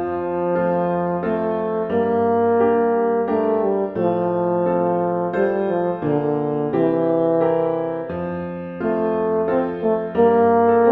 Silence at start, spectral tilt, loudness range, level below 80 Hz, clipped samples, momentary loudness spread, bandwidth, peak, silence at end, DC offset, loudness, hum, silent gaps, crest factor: 0 s; -11 dB/octave; 2 LU; -56 dBFS; under 0.1%; 6 LU; 4 kHz; -4 dBFS; 0 s; under 0.1%; -20 LUFS; none; none; 14 dB